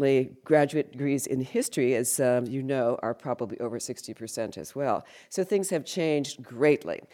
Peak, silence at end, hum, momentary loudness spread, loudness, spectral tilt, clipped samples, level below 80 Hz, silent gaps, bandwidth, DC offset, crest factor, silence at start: -8 dBFS; 0.1 s; none; 10 LU; -28 LUFS; -5 dB/octave; under 0.1%; -72 dBFS; none; 18.5 kHz; under 0.1%; 18 dB; 0 s